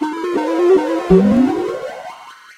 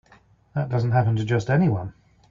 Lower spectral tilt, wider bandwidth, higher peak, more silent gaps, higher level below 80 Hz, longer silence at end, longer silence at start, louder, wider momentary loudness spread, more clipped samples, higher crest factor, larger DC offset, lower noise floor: about the same, -7.5 dB/octave vs -8.5 dB/octave; first, 11.5 kHz vs 7.4 kHz; first, 0 dBFS vs -8 dBFS; neither; first, -40 dBFS vs -52 dBFS; second, 0.05 s vs 0.4 s; second, 0 s vs 0.55 s; first, -15 LUFS vs -23 LUFS; first, 17 LU vs 10 LU; neither; about the same, 16 dB vs 14 dB; neither; second, -36 dBFS vs -56 dBFS